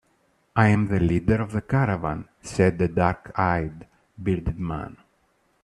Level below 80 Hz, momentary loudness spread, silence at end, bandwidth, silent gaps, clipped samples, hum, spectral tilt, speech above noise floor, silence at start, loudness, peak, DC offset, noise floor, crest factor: -42 dBFS; 12 LU; 0.7 s; 11 kHz; none; under 0.1%; none; -8 dB/octave; 43 dB; 0.55 s; -24 LUFS; -4 dBFS; under 0.1%; -66 dBFS; 20 dB